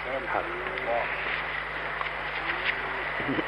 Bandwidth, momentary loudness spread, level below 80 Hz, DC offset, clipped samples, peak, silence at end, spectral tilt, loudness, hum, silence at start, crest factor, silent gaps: 12 kHz; 3 LU; -50 dBFS; under 0.1%; under 0.1%; -12 dBFS; 0 s; -5.5 dB/octave; -29 LUFS; none; 0 s; 18 dB; none